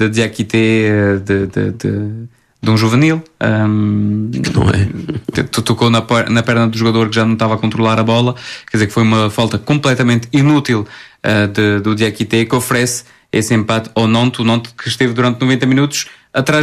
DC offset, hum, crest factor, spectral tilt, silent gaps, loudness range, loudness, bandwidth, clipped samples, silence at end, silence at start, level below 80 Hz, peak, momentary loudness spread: under 0.1%; none; 12 dB; -5.5 dB/octave; none; 1 LU; -14 LUFS; 14 kHz; under 0.1%; 0 s; 0 s; -44 dBFS; 0 dBFS; 7 LU